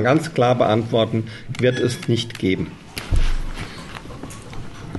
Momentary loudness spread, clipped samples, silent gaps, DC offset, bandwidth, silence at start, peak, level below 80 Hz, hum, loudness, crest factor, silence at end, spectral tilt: 17 LU; under 0.1%; none; 0.3%; 12 kHz; 0 s; -4 dBFS; -28 dBFS; none; -21 LUFS; 16 dB; 0 s; -6 dB/octave